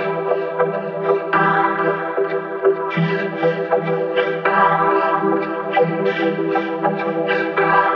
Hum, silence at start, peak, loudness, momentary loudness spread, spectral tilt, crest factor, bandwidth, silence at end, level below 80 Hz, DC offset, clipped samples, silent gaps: none; 0 s; -2 dBFS; -18 LUFS; 6 LU; -8.5 dB/octave; 16 dB; 6 kHz; 0 s; -80 dBFS; under 0.1%; under 0.1%; none